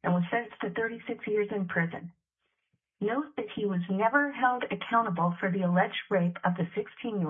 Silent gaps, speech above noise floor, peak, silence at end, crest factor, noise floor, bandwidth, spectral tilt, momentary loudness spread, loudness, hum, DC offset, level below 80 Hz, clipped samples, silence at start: none; 52 dB; -10 dBFS; 0 s; 20 dB; -81 dBFS; 3.8 kHz; -10 dB/octave; 9 LU; -30 LUFS; none; under 0.1%; -74 dBFS; under 0.1%; 0.05 s